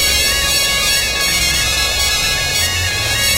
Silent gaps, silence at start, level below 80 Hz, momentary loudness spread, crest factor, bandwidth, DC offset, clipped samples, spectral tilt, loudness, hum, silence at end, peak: none; 0 s; -28 dBFS; 2 LU; 16 dB; 16 kHz; under 0.1%; under 0.1%; -0.5 dB/octave; -13 LUFS; none; 0 s; 0 dBFS